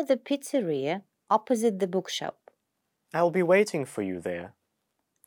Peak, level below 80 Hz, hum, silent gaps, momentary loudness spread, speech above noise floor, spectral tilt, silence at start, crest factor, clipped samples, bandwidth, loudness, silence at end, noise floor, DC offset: -10 dBFS; -80 dBFS; none; none; 13 LU; 53 dB; -5 dB/octave; 0 s; 18 dB; under 0.1%; over 20 kHz; -28 LUFS; 0.8 s; -80 dBFS; under 0.1%